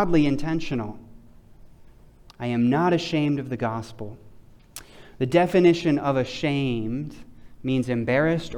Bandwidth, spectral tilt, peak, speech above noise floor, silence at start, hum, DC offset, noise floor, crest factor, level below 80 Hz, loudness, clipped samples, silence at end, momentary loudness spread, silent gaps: 16 kHz; -7 dB/octave; -6 dBFS; 27 dB; 0 s; none; under 0.1%; -50 dBFS; 18 dB; -46 dBFS; -24 LUFS; under 0.1%; 0 s; 19 LU; none